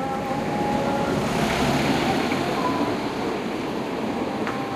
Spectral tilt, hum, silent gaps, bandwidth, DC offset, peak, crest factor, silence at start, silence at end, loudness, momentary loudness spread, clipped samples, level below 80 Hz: -5.5 dB/octave; none; none; 15.5 kHz; under 0.1%; -10 dBFS; 14 dB; 0 s; 0 s; -24 LUFS; 6 LU; under 0.1%; -46 dBFS